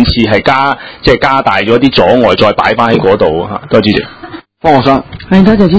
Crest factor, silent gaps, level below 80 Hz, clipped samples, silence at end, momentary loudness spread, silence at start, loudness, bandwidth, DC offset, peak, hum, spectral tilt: 8 dB; none; -28 dBFS; 3%; 0 s; 7 LU; 0 s; -9 LUFS; 8 kHz; 0.9%; 0 dBFS; none; -7 dB/octave